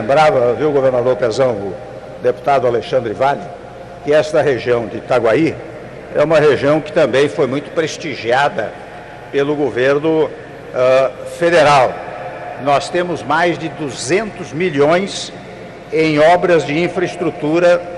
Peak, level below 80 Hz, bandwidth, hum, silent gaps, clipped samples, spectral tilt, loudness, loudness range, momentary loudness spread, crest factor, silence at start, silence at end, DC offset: -4 dBFS; -48 dBFS; 11.5 kHz; none; none; under 0.1%; -5.5 dB/octave; -15 LUFS; 3 LU; 15 LU; 12 dB; 0 s; 0 s; under 0.1%